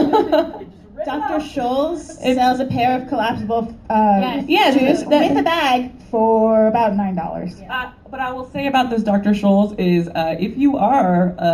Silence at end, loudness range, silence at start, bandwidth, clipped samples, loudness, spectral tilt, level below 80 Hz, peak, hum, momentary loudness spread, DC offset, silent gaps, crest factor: 0 s; 4 LU; 0 s; 14.5 kHz; under 0.1%; -17 LUFS; -6.5 dB/octave; -46 dBFS; -2 dBFS; none; 11 LU; under 0.1%; none; 16 dB